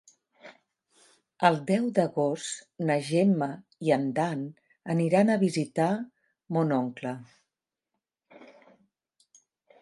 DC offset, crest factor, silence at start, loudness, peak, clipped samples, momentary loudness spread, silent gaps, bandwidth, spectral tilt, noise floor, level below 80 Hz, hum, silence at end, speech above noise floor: under 0.1%; 22 dB; 0.45 s; -27 LUFS; -6 dBFS; under 0.1%; 13 LU; none; 11.5 kHz; -6.5 dB/octave; -88 dBFS; -78 dBFS; none; 1.35 s; 61 dB